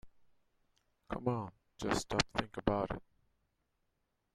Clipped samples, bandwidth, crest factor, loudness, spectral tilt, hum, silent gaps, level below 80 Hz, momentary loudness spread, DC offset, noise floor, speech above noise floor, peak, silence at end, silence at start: under 0.1%; 14 kHz; 28 dB; -37 LUFS; -4.5 dB/octave; none; none; -56 dBFS; 11 LU; under 0.1%; -82 dBFS; 46 dB; -12 dBFS; 1.35 s; 0.05 s